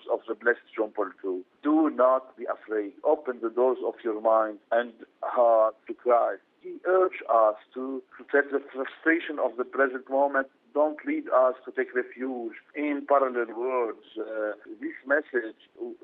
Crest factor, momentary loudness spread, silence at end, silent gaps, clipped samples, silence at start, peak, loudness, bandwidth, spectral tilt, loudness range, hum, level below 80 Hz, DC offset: 18 dB; 13 LU; 0.1 s; none; under 0.1%; 0.05 s; -10 dBFS; -27 LUFS; 4 kHz; -1.5 dB/octave; 3 LU; none; -82 dBFS; under 0.1%